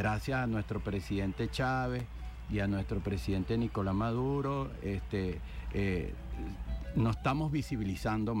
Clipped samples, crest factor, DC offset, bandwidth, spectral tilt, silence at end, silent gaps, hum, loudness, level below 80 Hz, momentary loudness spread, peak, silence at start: under 0.1%; 14 dB; under 0.1%; 16.5 kHz; -7.5 dB/octave; 0 s; none; none; -35 LUFS; -44 dBFS; 8 LU; -20 dBFS; 0 s